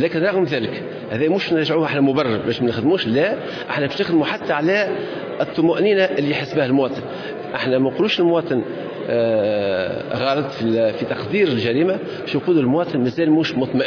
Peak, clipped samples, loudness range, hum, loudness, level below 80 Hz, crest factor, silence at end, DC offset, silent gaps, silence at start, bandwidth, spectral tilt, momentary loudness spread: -6 dBFS; under 0.1%; 1 LU; none; -19 LUFS; -60 dBFS; 14 dB; 0 s; under 0.1%; none; 0 s; 5.4 kHz; -7 dB/octave; 7 LU